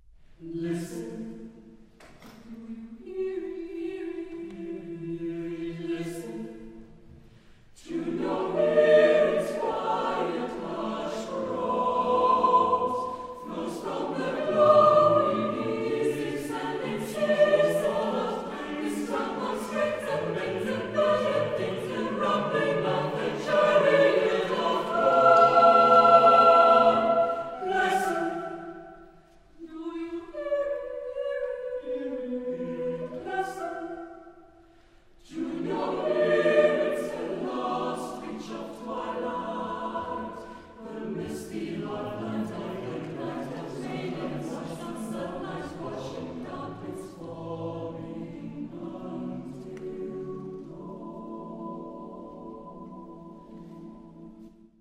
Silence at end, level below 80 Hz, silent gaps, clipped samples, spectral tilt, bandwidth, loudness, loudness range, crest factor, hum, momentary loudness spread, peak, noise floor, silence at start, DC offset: 0.3 s; -60 dBFS; none; under 0.1%; -5.5 dB/octave; 15 kHz; -26 LUFS; 17 LU; 22 dB; none; 21 LU; -6 dBFS; -56 dBFS; 0.4 s; under 0.1%